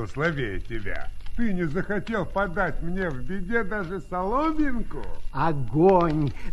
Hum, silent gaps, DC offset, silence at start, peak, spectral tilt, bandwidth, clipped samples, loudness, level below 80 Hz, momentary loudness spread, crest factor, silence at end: none; none; under 0.1%; 0 s; -6 dBFS; -8 dB/octave; 10.5 kHz; under 0.1%; -26 LUFS; -38 dBFS; 13 LU; 18 dB; 0 s